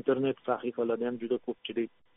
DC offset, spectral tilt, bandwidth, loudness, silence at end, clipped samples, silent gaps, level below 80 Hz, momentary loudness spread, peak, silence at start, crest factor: under 0.1%; -3.5 dB/octave; 3.9 kHz; -32 LUFS; 0.3 s; under 0.1%; none; -74 dBFS; 5 LU; -14 dBFS; 0.05 s; 18 dB